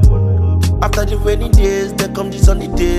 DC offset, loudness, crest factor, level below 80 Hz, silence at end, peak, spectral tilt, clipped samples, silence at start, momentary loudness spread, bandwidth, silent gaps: under 0.1%; -15 LUFS; 12 dB; -16 dBFS; 0 s; 0 dBFS; -6.5 dB/octave; under 0.1%; 0 s; 5 LU; 15 kHz; none